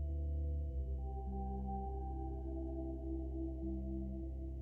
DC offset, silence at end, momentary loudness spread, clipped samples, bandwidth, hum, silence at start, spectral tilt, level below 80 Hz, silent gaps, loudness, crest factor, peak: under 0.1%; 0 s; 3 LU; under 0.1%; 1.1 kHz; none; 0 s; -12.5 dB/octave; -42 dBFS; none; -43 LUFS; 10 dB; -30 dBFS